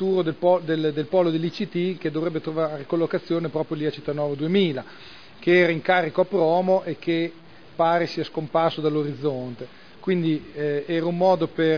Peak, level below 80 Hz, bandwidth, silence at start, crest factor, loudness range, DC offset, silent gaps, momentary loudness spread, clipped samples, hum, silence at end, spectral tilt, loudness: -6 dBFS; -66 dBFS; 5.4 kHz; 0 s; 18 dB; 4 LU; 0.4%; none; 9 LU; under 0.1%; none; 0 s; -8 dB/octave; -23 LUFS